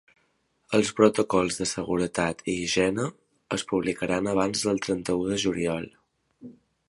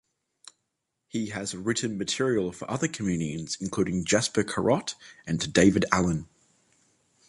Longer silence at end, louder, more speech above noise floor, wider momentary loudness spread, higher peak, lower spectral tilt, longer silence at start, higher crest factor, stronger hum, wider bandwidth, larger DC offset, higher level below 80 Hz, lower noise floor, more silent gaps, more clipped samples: second, 0.4 s vs 1.05 s; about the same, -26 LUFS vs -27 LUFS; second, 45 dB vs 54 dB; second, 9 LU vs 12 LU; about the same, -4 dBFS vs -4 dBFS; about the same, -4.5 dB/octave vs -4.5 dB/octave; second, 0.7 s vs 1.15 s; about the same, 24 dB vs 24 dB; neither; about the same, 11.5 kHz vs 11.5 kHz; neither; about the same, -56 dBFS vs -52 dBFS; second, -70 dBFS vs -81 dBFS; neither; neither